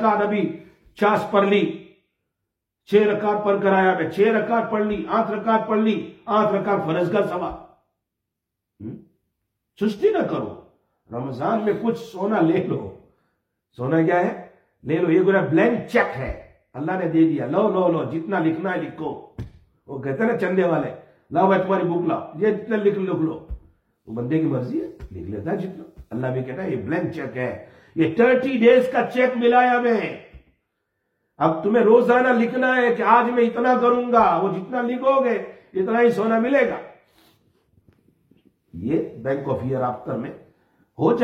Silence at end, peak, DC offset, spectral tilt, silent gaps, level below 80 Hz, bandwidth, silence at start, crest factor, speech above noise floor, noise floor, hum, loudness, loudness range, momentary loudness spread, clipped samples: 0 s; -2 dBFS; under 0.1%; -8 dB/octave; none; -52 dBFS; 9.4 kHz; 0 s; 18 dB; 62 dB; -82 dBFS; none; -21 LUFS; 9 LU; 15 LU; under 0.1%